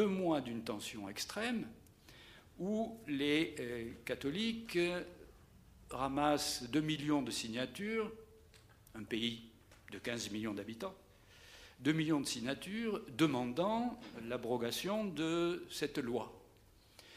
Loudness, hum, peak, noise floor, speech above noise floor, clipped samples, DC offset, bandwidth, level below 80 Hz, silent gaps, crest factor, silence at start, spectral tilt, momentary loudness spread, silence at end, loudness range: -38 LUFS; none; -18 dBFS; -65 dBFS; 27 dB; under 0.1%; under 0.1%; 15.5 kHz; -66 dBFS; none; 20 dB; 0 s; -4.5 dB/octave; 16 LU; 0 s; 5 LU